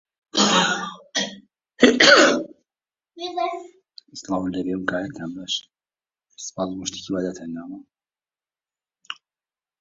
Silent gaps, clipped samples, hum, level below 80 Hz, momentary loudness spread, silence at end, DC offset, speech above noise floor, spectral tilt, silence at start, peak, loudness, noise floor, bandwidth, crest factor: none; under 0.1%; none; -60 dBFS; 23 LU; 0.7 s; under 0.1%; over 62 dB; -2.5 dB/octave; 0.35 s; 0 dBFS; -20 LUFS; under -90 dBFS; 7.8 kHz; 24 dB